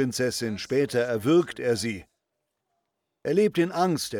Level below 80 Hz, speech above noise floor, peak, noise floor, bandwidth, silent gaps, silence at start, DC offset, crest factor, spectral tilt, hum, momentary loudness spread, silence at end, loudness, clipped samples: -64 dBFS; 56 dB; -10 dBFS; -81 dBFS; 18.5 kHz; none; 0 s; under 0.1%; 16 dB; -5 dB/octave; none; 8 LU; 0 s; -25 LUFS; under 0.1%